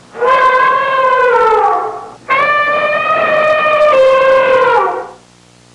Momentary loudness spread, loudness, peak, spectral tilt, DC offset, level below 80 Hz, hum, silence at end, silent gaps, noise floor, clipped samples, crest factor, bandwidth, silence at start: 9 LU; -10 LUFS; -2 dBFS; -3.5 dB/octave; under 0.1%; -50 dBFS; 60 Hz at -50 dBFS; 0.6 s; none; -44 dBFS; under 0.1%; 8 dB; 10.5 kHz; 0.15 s